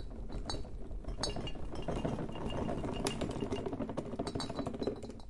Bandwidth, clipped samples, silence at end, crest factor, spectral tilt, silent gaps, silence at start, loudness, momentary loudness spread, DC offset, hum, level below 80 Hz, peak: 11.5 kHz; under 0.1%; 0 s; 24 dB; -5.5 dB/octave; none; 0 s; -40 LUFS; 7 LU; under 0.1%; none; -46 dBFS; -14 dBFS